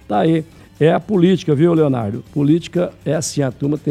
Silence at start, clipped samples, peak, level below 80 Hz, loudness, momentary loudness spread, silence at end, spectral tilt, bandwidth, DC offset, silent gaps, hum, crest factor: 0.1 s; under 0.1%; 0 dBFS; -50 dBFS; -17 LUFS; 7 LU; 0 s; -6.5 dB/octave; 13 kHz; under 0.1%; none; none; 16 dB